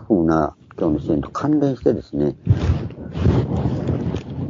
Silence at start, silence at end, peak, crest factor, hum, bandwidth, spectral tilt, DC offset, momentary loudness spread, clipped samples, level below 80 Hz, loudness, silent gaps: 0 s; 0 s; -2 dBFS; 18 dB; none; 7.4 kHz; -9.5 dB/octave; under 0.1%; 6 LU; under 0.1%; -34 dBFS; -21 LUFS; none